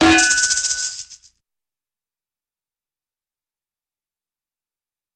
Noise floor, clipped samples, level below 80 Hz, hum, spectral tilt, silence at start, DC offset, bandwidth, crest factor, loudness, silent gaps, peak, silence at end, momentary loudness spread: under -90 dBFS; under 0.1%; -50 dBFS; none; -1 dB/octave; 0 s; under 0.1%; 11 kHz; 24 dB; -16 LUFS; none; 0 dBFS; 4 s; 14 LU